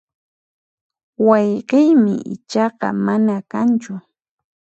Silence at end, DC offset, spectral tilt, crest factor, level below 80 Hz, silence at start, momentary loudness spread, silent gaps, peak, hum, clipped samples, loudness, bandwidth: 0.7 s; under 0.1%; -7.5 dB/octave; 18 dB; -68 dBFS; 1.2 s; 10 LU; none; 0 dBFS; none; under 0.1%; -17 LUFS; 8 kHz